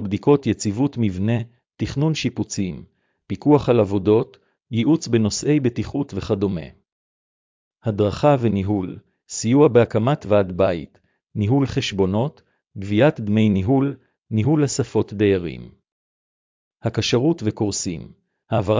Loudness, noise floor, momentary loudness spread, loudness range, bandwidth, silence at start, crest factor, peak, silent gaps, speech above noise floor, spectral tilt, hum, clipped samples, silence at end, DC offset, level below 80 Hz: -20 LUFS; under -90 dBFS; 12 LU; 4 LU; 7.6 kHz; 0 s; 18 dB; -2 dBFS; 6.92-7.71 s, 15.92-16.71 s; over 71 dB; -6.5 dB/octave; none; under 0.1%; 0 s; under 0.1%; -44 dBFS